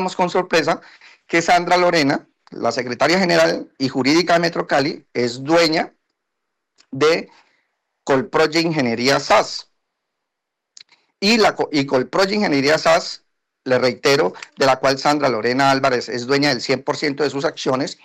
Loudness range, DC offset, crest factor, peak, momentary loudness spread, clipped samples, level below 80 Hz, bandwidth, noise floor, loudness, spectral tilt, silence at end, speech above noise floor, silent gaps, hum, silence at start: 3 LU; under 0.1%; 14 dB; -4 dBFS; 8 LU; under 0.1%; -56 dBFS; 15.5 kHz; -80 dBFS; -18 LUFS; -4 dB/octave; 0.1 s; 62 dB; none; none; 0 s